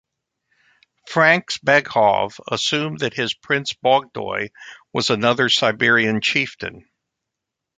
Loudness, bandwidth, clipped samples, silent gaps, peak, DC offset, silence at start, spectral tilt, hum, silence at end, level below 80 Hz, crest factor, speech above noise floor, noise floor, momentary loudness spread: -18 LUFS; 9.4 kHz; under 0.1%; none; -2 dBFS; under 0.1%; 1.05 s; -3.5 dB/octave; none; 1 s; -60 dBFS; 20 dB; 63 dB; -83 dBFS; 11 LU